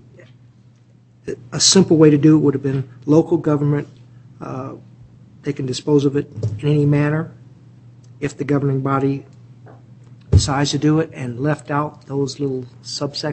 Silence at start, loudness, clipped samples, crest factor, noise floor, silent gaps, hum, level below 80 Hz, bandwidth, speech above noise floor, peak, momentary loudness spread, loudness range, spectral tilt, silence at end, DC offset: 1.25 s; -18 LUFS; under 0.1%; 18 dB; -50 dBFS; none; none; -40 dBFS; 8.6 kHz; 33 dB; 0 dBFS; 17 LU; 7 LU; -5.5 dB/octave; 0 s; under 0.1%